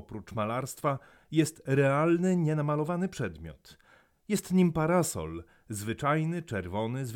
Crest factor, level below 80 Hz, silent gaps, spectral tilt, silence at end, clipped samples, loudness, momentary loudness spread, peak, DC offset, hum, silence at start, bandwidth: 16 dB; -58 dBFS; none; -6.5 dB/octave; 0 s; under 0.1%; -30 LUFS; 13 LU; -14 dBFS; under 0.1%; none; 0.1 s; 17.5 kHz